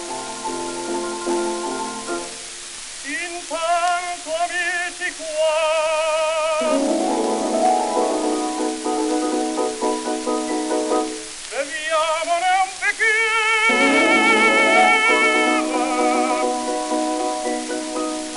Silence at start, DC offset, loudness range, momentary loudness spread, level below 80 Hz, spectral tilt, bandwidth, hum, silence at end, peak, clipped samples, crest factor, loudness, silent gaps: 0 s; under 0.1%; 9 LU; 13 LU; -54 dBFS; -1.5 dB/octave; 11.5 kHz; none; 0 s; -4 dBFS; under 0.1%; 18 dB; -19 LUFS; none